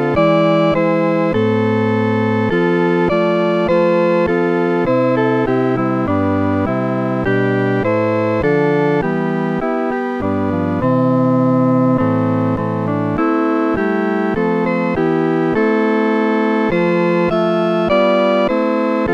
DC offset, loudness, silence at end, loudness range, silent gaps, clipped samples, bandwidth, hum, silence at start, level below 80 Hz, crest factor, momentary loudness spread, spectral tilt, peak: under 0.1%; -15 LUFS; 0 s; 2 LU; none; under 0.1%; 7.6 kHz; none; 0 s; -44 dBFS; 14 dB; 4 LU; -8.5 dB/octave; -2 dBFS